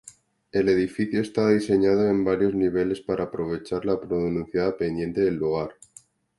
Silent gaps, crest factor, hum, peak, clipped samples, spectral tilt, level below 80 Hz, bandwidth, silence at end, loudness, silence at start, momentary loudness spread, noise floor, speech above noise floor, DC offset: none; 16 dB; none; -8 dBFS; under 0.1%; -7 dB/octave; -52 dBFS; 11.5 kHz; 0.65 s; -24 LUFS; 0.05 s; 8 LU; -51 dBFS; 27 dB; under 0.1%